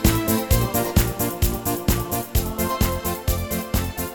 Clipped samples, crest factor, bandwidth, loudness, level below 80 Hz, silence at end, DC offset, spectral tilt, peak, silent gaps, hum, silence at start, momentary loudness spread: under 0.1%; 18 dB; over 20 kHz; -23 LUFS; -28 dBFS; 0 s; under 0.1%; -5 dB/octave; -4 dBFS; none; none; 0 s; 5 LU